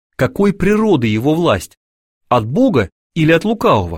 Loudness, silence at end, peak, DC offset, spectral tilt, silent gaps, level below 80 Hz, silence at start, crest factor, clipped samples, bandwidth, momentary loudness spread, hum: -15 LUFS; 0 s; -2 dBFS; 0.4%; -7 dB/octave; 1.77-2.21 s, 2.92-3.10 s; -38 dBFS; 0.2 s; 14 dB; under 0.1%; 16.5 kHz; 6 LU; none